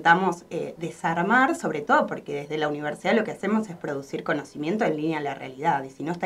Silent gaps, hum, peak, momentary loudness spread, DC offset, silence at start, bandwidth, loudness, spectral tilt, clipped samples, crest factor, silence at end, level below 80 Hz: none; none; -4 dBFS; 11 LU; under 0.1%; 0 s; 14 kHz; -26 LUFS; -5.5 dB/octave; under 0.1%; 20 dB; 0 s; -66 dBFS